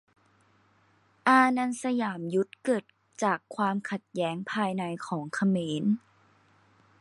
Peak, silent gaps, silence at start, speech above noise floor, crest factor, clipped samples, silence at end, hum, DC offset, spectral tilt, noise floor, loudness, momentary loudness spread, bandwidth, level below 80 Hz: -8 dBFS; none; 1.25 s; 37 dB; 22 dB; under 0.1%; 1 s; none; under 0.1%; -5.5 dB/octave; -65 dBFS; -28 LUFS; 11 LU; 11.5 kHz; -78 dBFS